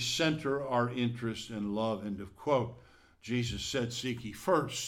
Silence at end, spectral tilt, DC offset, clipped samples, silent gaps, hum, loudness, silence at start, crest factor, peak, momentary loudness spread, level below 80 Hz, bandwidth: 0 s; -4.5 dB/octave; under 0.1%; under 0.1%; none; none; -33 LUFS; 0 s; 18 dB; -14 dBFS; 8 LU; -58 dBFS; 17 kHz